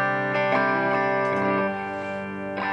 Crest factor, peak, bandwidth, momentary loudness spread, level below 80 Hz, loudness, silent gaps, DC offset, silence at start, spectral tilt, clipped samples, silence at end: 16 dB; -10 dBFS; 9.6 kHz; 9 LU; -68 dBFS; -24 LUFS; none; under 0.1%; 0 s; -7 dB/octave; under 0.1%; 0 s